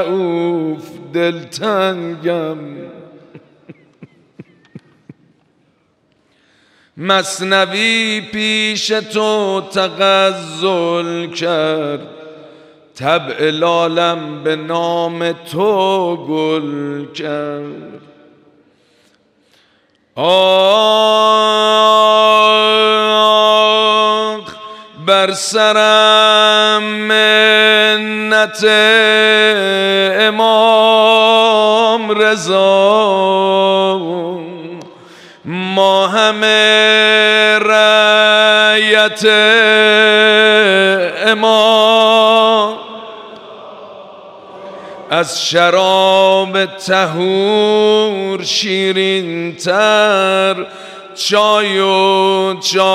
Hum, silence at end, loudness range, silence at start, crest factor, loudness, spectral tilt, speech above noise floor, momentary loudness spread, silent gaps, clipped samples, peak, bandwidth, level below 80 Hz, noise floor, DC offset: none; 0 s; 11 LU; 0 s; 12 dB; -11 LUFS; -3 dB/octave; 46 dB; 14 LU; none; under 0.1%; 0 dBFS; 15 kHz; -68 dBFS; -58 dBFS; under 0.1%